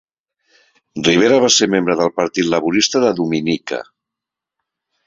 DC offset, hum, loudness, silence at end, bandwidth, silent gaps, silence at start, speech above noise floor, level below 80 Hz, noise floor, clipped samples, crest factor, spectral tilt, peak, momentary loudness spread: under 0.1%; none; -15 LUFS; 1.25 s; 7.8 kHz; none; 0.95 s; 69 dB; -56 dBFS; -84 dBFS; under 0.1%; 16 dB; -3.5 dB/octave; 0 dBFS; 10 LU